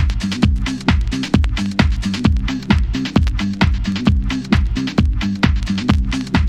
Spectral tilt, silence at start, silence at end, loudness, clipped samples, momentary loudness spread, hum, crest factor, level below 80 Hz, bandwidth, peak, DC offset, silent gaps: -6 dB/octave; 0 s; 0 s; -18 LUFS; under 0.1%; 2 LU; none; 16 dB; -20 dBFS; 10.5 kHz; 0 dBFS; under 0.1%; none